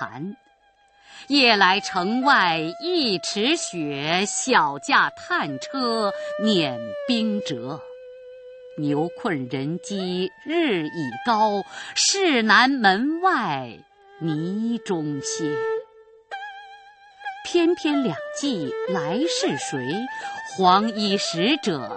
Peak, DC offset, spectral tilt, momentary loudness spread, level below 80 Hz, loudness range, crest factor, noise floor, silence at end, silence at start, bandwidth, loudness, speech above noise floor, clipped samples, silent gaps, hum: -2 dBFS; under 0.1%; -3.5 dB/octave; 16 LU; -68 dBFS; 7 LU; 22 dB; -59 dBFS; 0 s; 0 s; 8.8 kHz; -22 LUFS; 37 dB; under 0.1%; none; none